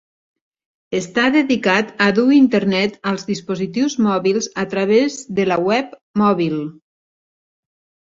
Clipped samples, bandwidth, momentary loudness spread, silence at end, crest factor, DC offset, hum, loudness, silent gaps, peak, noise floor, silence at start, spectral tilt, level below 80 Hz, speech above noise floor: under 0.1%; 7.8 kHz; 10 LU; 1.3 s; 16 dB; under 0.1%; none; -17 LUFS; 6.01-6.14 s; -2 dBFS; under -90 dBFS; 0.9 s; -5 dB/octave; -58 dBFS; over 73 dB